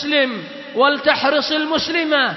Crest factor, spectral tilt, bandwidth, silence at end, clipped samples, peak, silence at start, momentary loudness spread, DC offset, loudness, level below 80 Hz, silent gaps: 16 dB; -3.5 dB/octave; 6.2 kHz; 0 s; under 0.1%; -2 dBFS; 0 s; 7 LU; under 0.1%; -17 LUFS; -58 dBFS; none